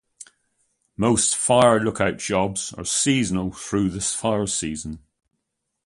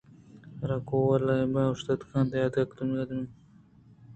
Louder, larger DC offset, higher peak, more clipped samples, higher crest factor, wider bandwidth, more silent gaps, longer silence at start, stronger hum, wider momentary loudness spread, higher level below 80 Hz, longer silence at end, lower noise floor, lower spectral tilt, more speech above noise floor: first, -21 LUFS vs -29 LUFS; neither; first, -4 dBFS vs -12 dBFS; neither; about the same, 20 dB vs 18 dB; first, 11.5 kHz vs 8.4 kHz; neither; second, 0.2 s vs 0.35 s; neither; about the same, 11 LU vs 12 LU; first, -48 dBFS vs -58 dBFS; first, 0.9 s vs 0 s; first, -78 dBFS vs -56 dBFS; second, -4 dB/octave vs -8 dB/octave; first, 57 dB vs 29 dB